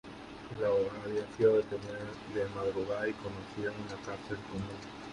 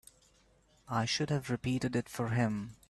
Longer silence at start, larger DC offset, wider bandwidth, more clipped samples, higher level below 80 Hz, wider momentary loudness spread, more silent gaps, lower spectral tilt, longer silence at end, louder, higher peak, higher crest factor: second, 0.05 s vs 0.9 s; neither; second, 11 kHz vs 13 kHz; neither; about the same, -60 dBFS vs -62 dBFS; first, 14 LU vs 3 LU; neither; about the same, -6.5 dB/octave vs -5.5 dB/octave; second, 0 s vs 0.15 s; about the same, -35 LUFS vs -34 LUFS; first, -14 dBFS vs -18 dBFS; about the same, 20 dB vs 18 dB